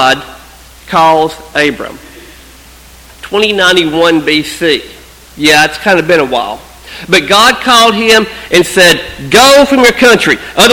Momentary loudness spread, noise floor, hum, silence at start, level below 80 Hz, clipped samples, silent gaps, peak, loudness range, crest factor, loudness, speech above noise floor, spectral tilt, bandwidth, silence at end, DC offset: 10 LU; -35 dBFS; none; 0 s; -38 dBFS; 2%; none; 0 dBFS; 6 LU; 10 dB; -7 LUFS; 27 dB; -2.5 dB/octave; over 20 kHz; 0 s; under 0.1%